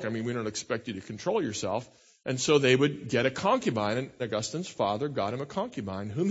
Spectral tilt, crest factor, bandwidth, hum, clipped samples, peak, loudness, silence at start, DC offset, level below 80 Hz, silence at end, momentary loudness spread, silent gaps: -4.5 dB/octave; 20 dB; 8 kHz; none; under 0.1%; -10 dBFS; -29 LUFS; 0 s; under 0.1%; -66 dBFS; 0 s; 11 LU; none